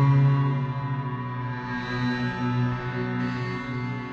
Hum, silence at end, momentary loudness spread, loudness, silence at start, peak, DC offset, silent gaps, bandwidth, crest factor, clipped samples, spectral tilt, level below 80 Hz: none; 0 s; 9 LU; -27 LUFS; 0 s; -10 dBFS; under 0.1%; none; 6.6 kHz; 14 dB; under 0.1%; -8.5 dB/octave; -52 dBFS